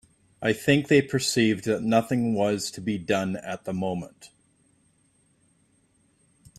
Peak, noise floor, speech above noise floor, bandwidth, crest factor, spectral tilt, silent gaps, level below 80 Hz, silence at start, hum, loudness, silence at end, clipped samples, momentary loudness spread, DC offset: -6 dBFS; -65 dBFS; 41 dB; 14.5 kHz; 20 dB; -5 dB/octave; none; -62 dBFS; 0.4 s; none; -25 LUFS; 2.3 s; under 0.1%; 10 LU; under 0.1%